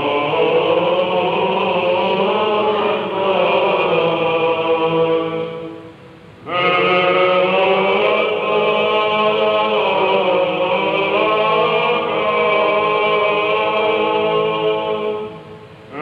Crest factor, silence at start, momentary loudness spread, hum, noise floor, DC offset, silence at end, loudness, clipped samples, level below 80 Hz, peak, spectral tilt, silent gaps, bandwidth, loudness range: 14 dB; 0 s; 5 LU; none; -40 dBFS; under 0.1%; 0 s; -16 LUFS; under 0.1%; -60 dBFS; -2 dBFS; -6.5 dB/octave; none; 6.4 kHz; 2 LU